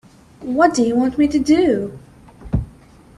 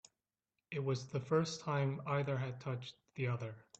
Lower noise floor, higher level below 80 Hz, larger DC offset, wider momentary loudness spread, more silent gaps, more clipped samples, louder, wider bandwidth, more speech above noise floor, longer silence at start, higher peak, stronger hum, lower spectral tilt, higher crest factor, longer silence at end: second, -45 dBFS vs under -90 dBFS; first, -36 dBFS vs -74 dBFS; neither; first, 15 LU vs 9 LU; neither; neither; first, -17 LUFS vs -39 LUFS; first, 11 kHz vs 8.4 kHz; second, 29 dB vs over 52 dB; second, 0.4 s vs 0.7 s; first, -2 dBFS vs -22 dBFS; neither; about the same, -6 dB/octave vs -6.5 dB/octave; about the same, 18 dB vs 18 dB; first, 0.5 s vs 0.2 s